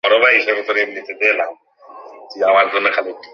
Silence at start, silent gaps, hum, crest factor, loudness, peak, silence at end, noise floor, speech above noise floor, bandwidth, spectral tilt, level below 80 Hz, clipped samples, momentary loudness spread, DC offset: 0.05 s; none; none; 16 dB; -15 LUFS; -2 dBFS; 0.1 s; -39 dBFS; 23 dB; 7 kHz; -3 dB/octave; -68 dBFS; under 0.1%; 11 LU; under 0.1%